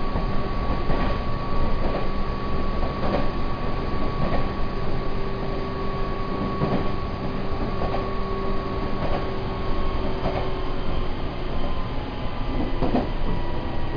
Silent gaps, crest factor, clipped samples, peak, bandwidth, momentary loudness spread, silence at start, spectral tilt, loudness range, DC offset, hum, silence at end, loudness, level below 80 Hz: none; 14 dB; under 0.1%; -8 dBFS; 5.2 kHz; 4 LU; 0 s; -8.5 dB/octave; 1 LU; under 0.1%; none; 0 s; -28 LUFS; -26 dBFS